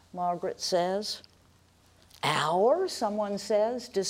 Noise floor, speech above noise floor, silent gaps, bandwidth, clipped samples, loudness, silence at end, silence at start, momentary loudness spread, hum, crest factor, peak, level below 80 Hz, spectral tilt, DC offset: -61 dBFS; 33 dB; none; 16 kHz; under 0.1%; -29 LUFS; 0 s; 0.15 s; 8 LU; none; 18 dB; -12 dBFS; -70 dBFS; -4 dB/octave; under 0.1%